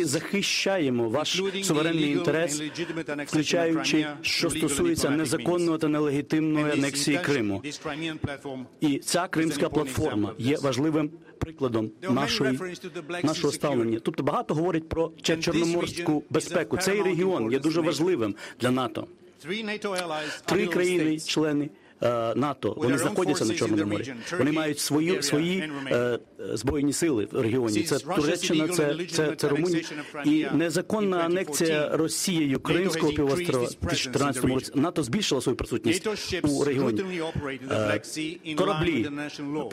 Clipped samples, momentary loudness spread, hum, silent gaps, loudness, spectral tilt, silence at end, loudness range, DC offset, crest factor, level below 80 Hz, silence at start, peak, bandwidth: under 0.1%; 7 LU; none; none; -26 LUFS; -4.5 dB/octave; 0 s; 2 LU; under 0.1%; 16 dB; -54 dBFS; 0 s; -10 dBFS; 16 kHz